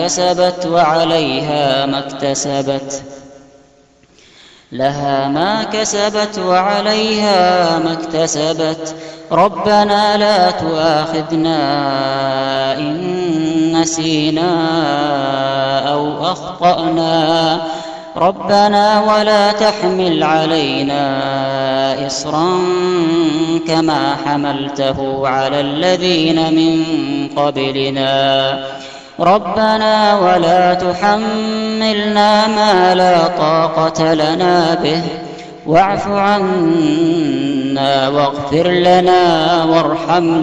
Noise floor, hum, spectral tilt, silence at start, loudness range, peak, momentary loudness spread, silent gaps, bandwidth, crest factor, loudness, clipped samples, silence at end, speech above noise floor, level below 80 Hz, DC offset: -49 dBFS; none; -4.5 dB/octave; 0 s; 3 LU; 0 dBFS; 7 LU; none; 9.8 kHz; 14 dB; -14 LUFS; under 0.1%; 0 s; 35 dB; -48 dBFS; under 0.1%